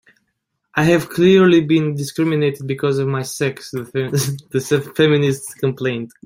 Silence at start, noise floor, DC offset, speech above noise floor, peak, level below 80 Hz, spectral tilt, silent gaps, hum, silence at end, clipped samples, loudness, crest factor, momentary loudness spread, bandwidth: 0.75 s; -73 dBFS; under 0.1%; 56 dB; -2 dBFS; -54 dBFS; -6 dB/octave; none; none; 0.2 s; under 0.1%; -17 LUFS; 16 dB; 11 LU; 16.5 kHz